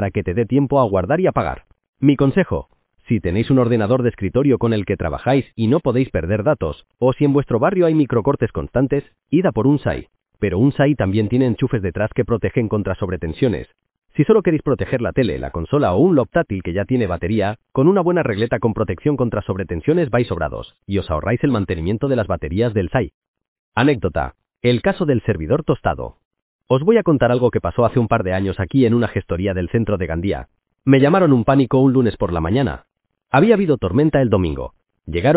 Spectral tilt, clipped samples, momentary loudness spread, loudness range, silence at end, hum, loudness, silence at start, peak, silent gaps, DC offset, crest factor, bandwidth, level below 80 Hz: -12 dB/octave; under 0.1%; 9 LU; 3 LU; 0 s; none; -18 LUFS; 0 s; 0 dBFS; 1.89-1.93 s, 23.14-23.22 s, 23.28-23.34 s, 23.48-23.72 s, 26.25-26.31 s, 26.42-26.59 s; under 0.1%; 18 dB; 4 kHz; -36 dBFS